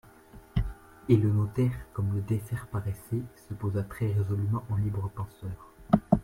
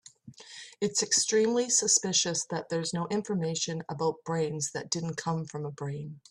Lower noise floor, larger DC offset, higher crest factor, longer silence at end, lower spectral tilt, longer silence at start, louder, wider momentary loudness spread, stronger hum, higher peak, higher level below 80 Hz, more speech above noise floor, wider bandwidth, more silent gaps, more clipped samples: about the same, -52 dBFS vs -51 dBFS; neither; about the same, 22 dB vs 22 dB; second, 0 s vs 0.15 s; first, -9 dB/octave vs -3 dB/octave; about the same, 0.35 s vs 0.25 s; about the same, -30 LUFS vs -29 LUFS; about the same, 14 LU vs 14 LU; neither; about the same, -6 dBFS vs -8 dBFS; first, -44 dBFS vs -70 dBFS; about the same, 23 dB vs 21 dB; first, 15.5 kHz vs 13 kHz; neither; neither